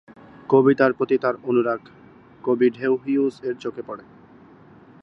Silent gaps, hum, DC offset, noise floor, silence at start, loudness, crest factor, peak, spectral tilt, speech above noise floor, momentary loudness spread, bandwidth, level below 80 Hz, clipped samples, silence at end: none; none; under 0.1%; -48 dBFS; 0.5 s; -21 LUFS; 20 dB; -2 dBFS; -8.5 dB/octave; 28 dB; 16 LU; 6.2 kHz; -66 dBFS; under 0.1%; 1.05 s